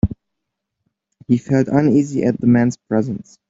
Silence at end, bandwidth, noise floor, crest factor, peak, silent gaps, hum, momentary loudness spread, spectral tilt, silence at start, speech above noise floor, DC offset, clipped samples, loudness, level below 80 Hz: 0.25 s; 7.8 kHz; -78 dBFS; 18 dB; -2 dBFS; none; none; 8 LU; -8.5 dB/octave; 0.05 s; 62 dB; under 0.1%; under 0.1%; -17 LUFS; -40 dBFS